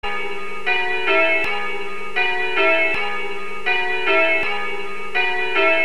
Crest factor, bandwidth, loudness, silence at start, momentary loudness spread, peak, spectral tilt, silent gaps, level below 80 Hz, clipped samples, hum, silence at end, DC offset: 16 dB; 13.5 kHz; -19 LUFS; 0 s; 11 LU; -4 dBFS; -3.5 dB/octave; none; -52 dBFS; under 0.1%; none; 0 s; 7%